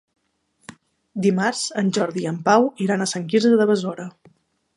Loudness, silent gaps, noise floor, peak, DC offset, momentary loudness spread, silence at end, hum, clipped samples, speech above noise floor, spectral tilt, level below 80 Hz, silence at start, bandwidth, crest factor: -20 LUFS; none; -65 dBFS; -2 dBFS; under 0.1%; 12 LU; 0.65 s; none; under 0.1%; 45 dB; -5 dB/octave; -70 dBFS; 0.7 s; 11.5 kHz; 20 dB